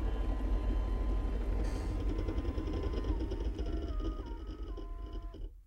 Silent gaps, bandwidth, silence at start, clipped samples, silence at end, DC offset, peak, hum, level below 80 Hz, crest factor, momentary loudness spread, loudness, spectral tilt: none; 6.8 kHz; 0 s; under 0.1%; 0 s; under 0.1%; -22 dBFS; none; -36 dBFS; 14 dB; 9 LU; -38 LUFS; -8 dB/octave